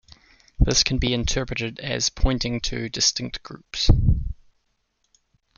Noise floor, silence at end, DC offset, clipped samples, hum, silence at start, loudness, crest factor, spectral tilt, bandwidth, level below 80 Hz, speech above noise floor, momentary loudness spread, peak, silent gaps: -71 dBFS; 1.25 s; under 0.1%; under 0.1%; none; 0.6 s; -23 LUFS; 20 dB; -3.5 dB/octave; 7.4 kHz; -28 dBFS; 49 dB; 14 LU; -4 dBFS; none